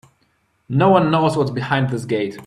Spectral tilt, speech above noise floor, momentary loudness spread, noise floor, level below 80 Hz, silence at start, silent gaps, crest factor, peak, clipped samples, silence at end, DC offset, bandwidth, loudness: -7 dB/octave; 46 dB; 8 LU; -64 dBFS; -56 dBFS; 0.7 s; none; 18 dB; 0 dBFS; under 0.1%; 0 s; under 0.1%; 12 kHz; -18 LUFS